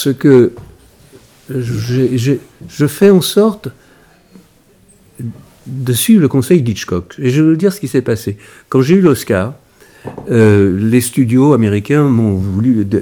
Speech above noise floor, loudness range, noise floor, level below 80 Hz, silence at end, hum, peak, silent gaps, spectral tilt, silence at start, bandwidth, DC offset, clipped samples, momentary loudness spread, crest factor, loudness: 36 dB; 4 LU; -48 dBFS; -50 dBFS; 0 s; none; 0 dBFS; none; -6.5 dB/octave; 0 s; over 20 kHz; under 0.1%; 0.4%; 18 LU; 12 dB; -12 LUFS